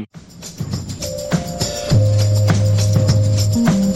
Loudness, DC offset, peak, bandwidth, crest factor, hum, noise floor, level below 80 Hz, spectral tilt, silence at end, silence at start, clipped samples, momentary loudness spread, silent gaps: -17 LUFS; under 0.1%; -2 dBFS; 15.5 kHz; 14 dB; none; -36 dBFS; -36 dBFS; -6 dB/octave; 0 s; 0 s; under 0.1%; 13 LU; none